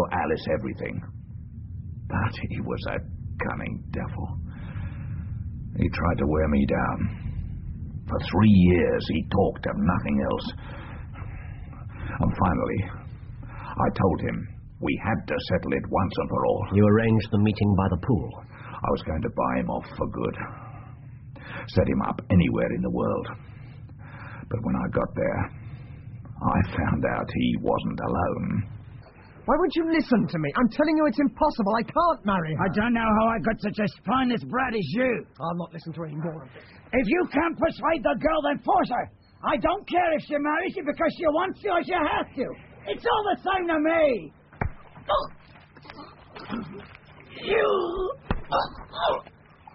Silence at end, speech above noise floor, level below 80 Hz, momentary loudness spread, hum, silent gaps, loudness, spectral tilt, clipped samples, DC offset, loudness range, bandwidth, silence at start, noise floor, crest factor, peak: 0.45 s; 25 dB; -42 dBFS; 18 LU; none; none; -26 LUFS; -6 dB/octave; under 0.1%; under 0.1%; 7 LU; 5.8 kHz; 0 s; -50 dBFS; 20 dB; -6 dBFS